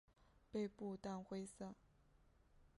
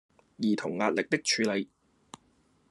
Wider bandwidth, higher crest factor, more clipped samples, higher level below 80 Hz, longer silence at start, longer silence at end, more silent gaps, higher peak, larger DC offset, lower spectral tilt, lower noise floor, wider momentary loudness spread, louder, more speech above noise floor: about the same, 11.5 kHz vs 12 kHz; about the same, 18 dB vs 22 dB; neither; about the same, -74 dBFS vs -76 dBFS; second, 0.2 s vs 0.4 s; second, 0.1 s vs 1.05 s; neither; second, -34 dBFS vs -10 dBFS; neither; first, -6.5 dB/octave vs -3.5 dB/octave; first, -73 dBFS vs -67 dBFS; about the same, 9 LU vs 7 LU; second, -50 LUFS vs -29 LUFS; second, 25 dB vs 38 dB